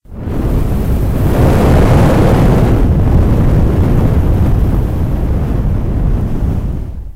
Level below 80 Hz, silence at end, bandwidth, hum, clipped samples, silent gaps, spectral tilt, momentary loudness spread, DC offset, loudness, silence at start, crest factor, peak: -14 dBFS; 0.05 s; 16 kHz; none; under 0.1%; none; -8.5 dB/octave; 7 LU; under 0.1%; -13 LUFS; 0.1 s; 10 dB; 0 dBFS